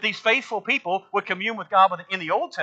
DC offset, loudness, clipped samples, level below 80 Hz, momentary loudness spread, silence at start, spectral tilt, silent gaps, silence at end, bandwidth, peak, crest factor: under 0.1%; -22 LUFS; under 0.1%; -82 dBFS; 7 LU; 0 s; -3.5 dB/octave; none; 0 s; 8 kHz; -4 dBFS; 20 dB